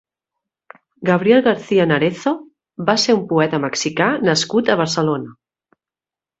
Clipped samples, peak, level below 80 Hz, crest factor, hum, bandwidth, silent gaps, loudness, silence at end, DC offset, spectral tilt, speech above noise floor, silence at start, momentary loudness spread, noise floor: under 0.1%; 0 dBFS; -60 dBFS; 18 dB; none; 8.2 kHz; none; -17 LUFS; 1.1 s; under 0.1%; -4.5 dB/octave; over 74 dB; 1 s; 9 LU; under -90 dBFS